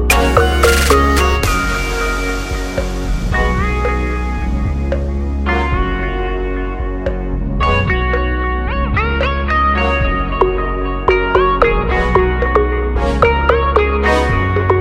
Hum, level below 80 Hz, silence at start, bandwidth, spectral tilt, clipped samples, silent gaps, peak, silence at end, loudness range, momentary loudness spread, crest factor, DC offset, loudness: none; -18 dBFS; 0 s; 16.5 kHz; -5.5 dB/octave; under 0.1%; none; 0 dBFS; 0 s; 5 LU; 9 LU; 14 dB; under 0.1%; -15 LUFS